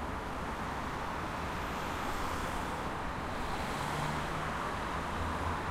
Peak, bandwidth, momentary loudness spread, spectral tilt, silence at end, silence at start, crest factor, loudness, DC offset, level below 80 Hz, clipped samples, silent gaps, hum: -24 dBFS; 16 kHz; 3 LU; -5 dB/octave; 0 s; 0 s; 14 dB; -37 LUFS; under 0.1%; -46 dBFS; under 0.1%; none; none